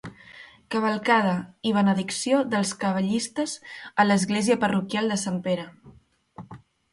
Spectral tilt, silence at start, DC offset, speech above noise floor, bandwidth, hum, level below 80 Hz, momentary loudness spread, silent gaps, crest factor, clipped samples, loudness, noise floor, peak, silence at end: -4.5 dB/octave; 0.05 s; under 0.1%; 24 dB; 11.5 kHz; none; -64 dBFS; 17 LU; none; 18 dB; under 0.1%; -24 LUFS; -48 dBFS; -6 dBFS; 0.35 s